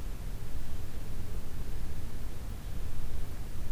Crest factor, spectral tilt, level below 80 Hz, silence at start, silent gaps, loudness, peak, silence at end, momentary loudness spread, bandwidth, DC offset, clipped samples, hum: 10 dB; -5.5 dB/octave; -36 dBFS; 0 s; none; -43 LUFS; -18 dBFS; 0 s; 1 LU; 15 kHz; under 0.1%; under 0.1%; none